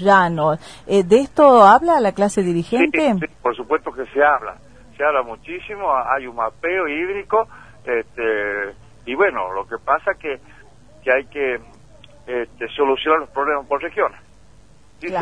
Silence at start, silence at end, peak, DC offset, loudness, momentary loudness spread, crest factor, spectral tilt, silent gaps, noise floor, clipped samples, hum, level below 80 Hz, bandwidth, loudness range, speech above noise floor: 0 s; 0 s; 0 dBFS; 0.4%; -18 LUFS; 14 LU; 18 dB; -5.5 dB/octave; none; -50 dBFS; under 0.1%; 50 Hz at -55 dBFS; -52 dBFS; 10.5 kHz; 8 LU; 32 dB